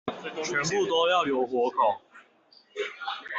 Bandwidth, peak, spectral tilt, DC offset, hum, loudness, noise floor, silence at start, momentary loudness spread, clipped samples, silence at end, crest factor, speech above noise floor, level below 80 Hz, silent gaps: 8 kHz; -12 dBFS; -3 dB/octave; under 0.1%; none; -27 LUFS; -60 dBFS; 0.05 s; 12 LU; under 0.1%; 0 s; 16 dB; 34 dB; -70 dBFS; none